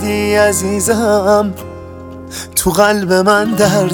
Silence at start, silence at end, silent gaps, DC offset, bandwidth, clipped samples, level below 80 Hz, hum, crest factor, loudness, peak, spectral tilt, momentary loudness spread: 0 s; 0 s; none; under 0.1%; 19 kHz; under 0.1%; -38 dBFS; none; 14 dB; -12 LUFS; 0 dBFS; -4 dB/octave; 18 LU